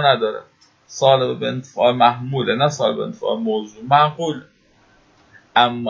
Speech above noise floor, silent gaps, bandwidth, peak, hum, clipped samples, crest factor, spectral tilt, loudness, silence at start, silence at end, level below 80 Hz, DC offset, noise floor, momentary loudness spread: 37 dB; none; 7.6 kHz; 0 dBFS; none; under 0.1%; 18 dB; -5 dB/octave; -18 LUFS; 0 s; 0 s; -62 dBFS; under 0.1%; -55 dBFS; 10 LU